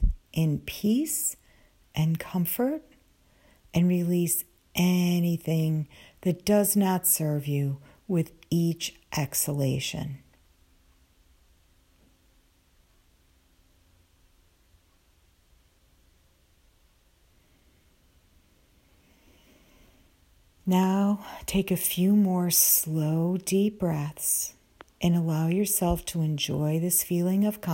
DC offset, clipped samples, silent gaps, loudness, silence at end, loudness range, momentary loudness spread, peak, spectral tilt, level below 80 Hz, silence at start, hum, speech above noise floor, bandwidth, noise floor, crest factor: under 0.1%; under 0.1%; none; -26 LUFS; 0 s; 8 LU; 10 LU; -6 dBFS; -5 dB/octave; -44 dBFS; 0 s; none; 38 dB; 16.5 kHz; -63 dBFS; 22 dB